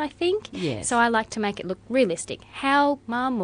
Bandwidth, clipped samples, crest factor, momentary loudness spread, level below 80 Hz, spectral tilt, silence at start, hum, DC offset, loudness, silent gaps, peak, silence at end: 11 kHz; under 0.1%; 16 dB; 9 LU; -56 dBFS; -4 dB/octave; 0 s; none; under 0.1%; -24 LUFS; none; -8 dBFS; 0 s